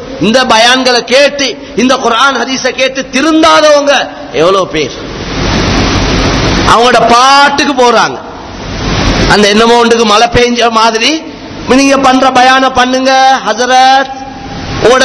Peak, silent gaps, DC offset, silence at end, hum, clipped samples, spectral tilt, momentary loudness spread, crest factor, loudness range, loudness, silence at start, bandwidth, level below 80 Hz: 0 dBFS; none; under 0.1%; 0 s; none; 5%; -3.5 dB/octave; 12 LU; 8 dB; 2 LU; -7 LUFS; 0 s; 11 kHz; -24 dBFS